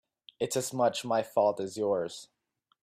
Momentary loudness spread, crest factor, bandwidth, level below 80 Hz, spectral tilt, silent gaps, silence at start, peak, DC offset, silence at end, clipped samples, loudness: 9 LU; 18 dB; 16 kHz; -76 dBFS; -4 dB/octave; none; 0.4 s; -14 dBFS; under 0.1%; 0.6 s; under 0.1%; -30 LUFS